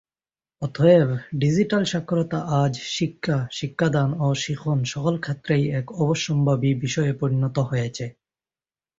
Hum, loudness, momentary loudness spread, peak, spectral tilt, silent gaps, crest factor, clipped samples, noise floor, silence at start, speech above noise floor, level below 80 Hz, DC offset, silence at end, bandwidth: none; -23 LUFS; 6 LU; -4 dBFS; -6.5 dB/octave; none; 18 dB; under 0.1%; under -90 dBFS; 0.6 s; over 68 dB; -54 dBFS; under 0.1%; 0.9 s; 7.8 kHz